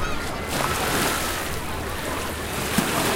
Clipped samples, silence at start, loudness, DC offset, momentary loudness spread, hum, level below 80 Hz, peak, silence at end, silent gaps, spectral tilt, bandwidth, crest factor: under 0.1%; 0 s; -25 LUFS; under 0.1%; 7 LU; none; -36 dBFS; -4 dBFS; 0 s; none; -3 dB/octave; 17 kHz; 20 dB